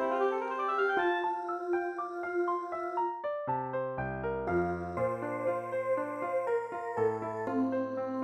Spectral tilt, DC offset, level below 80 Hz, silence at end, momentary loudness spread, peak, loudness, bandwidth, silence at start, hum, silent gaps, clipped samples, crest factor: -7.5 dB/octave; under 0.1%; -60 dBFS; 0 s; 5 LU; -18 dBFS; -33 LUFS; 9.2 kHz; 0 s; none; none; under 0.1%; 14 dB